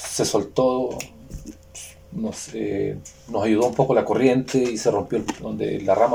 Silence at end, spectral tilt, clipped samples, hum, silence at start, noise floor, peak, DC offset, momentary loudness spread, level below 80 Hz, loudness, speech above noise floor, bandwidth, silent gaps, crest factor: 0 s; -5 dB/octave; under 0.1%; none; 0 s; -42 dBFS; -4 dBFS; under 0.1%; 19 LU; -50 dBFS; -22 LUFS; 20 dB; 19 kHz; none; 18 dB